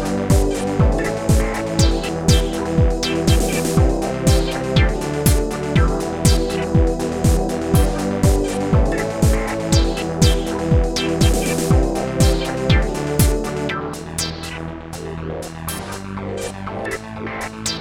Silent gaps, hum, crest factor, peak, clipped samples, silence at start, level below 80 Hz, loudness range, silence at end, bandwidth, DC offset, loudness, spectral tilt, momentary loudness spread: none; none; 16 dB; -2 dBFS; under 0.1%; 0 s; -22 dBFS; 8 LU; 0 s; 18 kHz; under 0.1%; -19 LUFS; -5.5 dB/octave; 10 LU